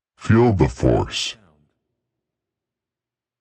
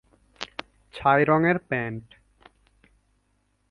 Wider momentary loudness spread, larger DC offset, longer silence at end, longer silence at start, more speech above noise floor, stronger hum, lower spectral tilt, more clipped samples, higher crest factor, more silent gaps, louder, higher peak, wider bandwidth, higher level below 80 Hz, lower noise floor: second, 9 LU vs 21 LU; neither; first, 2.1 s vs 1.7 s; second, 0.2 s vs 0.4 s; first, 71 dB vs 47 dB; second, none vs 50 Hz at -60 dBFS; second, -6 dB/octave vs -7.5 dB/octave; neither; about the same, 20 dB vs 22 dB; neither; first, -19 LUFS vs -23 LUFS; first, -2 dBFS vs -6 dBFS; second, 8.8 kHz vs 11 kHz; first, -38 dBFS vs -58 dBFS; first, -89 dBFS vs -70 dBFS